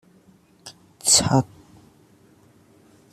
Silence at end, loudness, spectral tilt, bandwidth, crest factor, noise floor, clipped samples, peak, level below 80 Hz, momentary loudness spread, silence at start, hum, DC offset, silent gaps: 1.7 s; -18 LUFS; -3 dB/octave; 14.5 kHz; 24 dB; -55 dBFS; under 0.1%; -4 dBFS; -54 dBFS; 28 LU; 0.65 s; none; under 0.1%; none